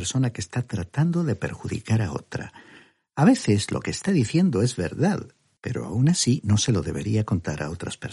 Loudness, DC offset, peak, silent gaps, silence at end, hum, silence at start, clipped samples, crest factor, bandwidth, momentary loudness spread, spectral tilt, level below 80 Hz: -24 LUFS; under 0.1%; -6 dBFS; none; 0 s; none; 0 s; under 0.1%; 18 dB; 11.5 kHz; 12 LU; -5.5 dB/octave; -50 dBFS